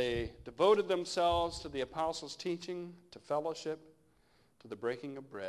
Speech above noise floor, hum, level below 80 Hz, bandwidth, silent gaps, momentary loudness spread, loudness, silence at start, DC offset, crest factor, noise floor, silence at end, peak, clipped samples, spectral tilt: 35 dB; none; -58 dBFS; 12 kHz; none; 15 LU; -35 LUFS; 0 s; under 0.1%; 20 dB; -70 dBFS; 0 s; -16 dBFS; under 0.1%; -4.5 dB/octave